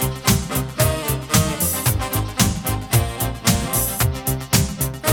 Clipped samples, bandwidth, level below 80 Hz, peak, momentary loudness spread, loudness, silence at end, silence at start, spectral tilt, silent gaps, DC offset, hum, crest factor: under 0.1%; over 20 kHz; -32 dBFS; -4 dBFS; 5 LU; -20 LUFS; 0 s; 0 s; -4 dB/octave; none; under 0.1%; none; 16 dB